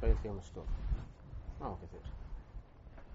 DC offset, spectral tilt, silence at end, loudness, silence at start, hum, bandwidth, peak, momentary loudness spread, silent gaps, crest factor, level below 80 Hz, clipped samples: under 0.1%; -8 dB/octave; 0 s; -44 LUFS; 0 s; none; 7.6 kHz; -18 dBFS; 16 LU; none; 22 dB; -40 dBFS; under 0.1%